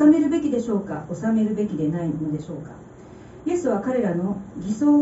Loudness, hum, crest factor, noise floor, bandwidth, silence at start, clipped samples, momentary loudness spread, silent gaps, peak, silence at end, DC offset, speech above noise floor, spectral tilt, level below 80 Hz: -24 LUFS; none; 16 dB; -43 dBFS; 8 kHz; 0 s; under 0.1%; 18 LU; none; -6 dBFS; 0 s; under 0.1%; 20 dB; -8.5 dB/octave; -54 dBFS